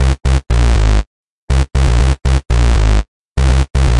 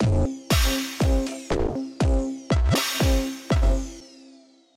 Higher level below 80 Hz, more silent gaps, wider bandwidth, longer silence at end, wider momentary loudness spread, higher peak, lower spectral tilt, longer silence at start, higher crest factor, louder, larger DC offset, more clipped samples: first, -12 dBFS vs -26 dBFS; first, 1.07-1.48 s, 3.08-3.36 s vs none; second, 11 kHz vs 16 kHz; second, 0 s vs 0.7 s; about the same, 6 LU vs 6 LU; first, 0 dBFS vs -8 dBFS; about the same, -6 dB/octave vs -5 dB/octave; about the same, 0 s vs 0 s; about the same, 12 dB vs 16 dB; first, -15 LUFS vs -24 LUFS; neither; neither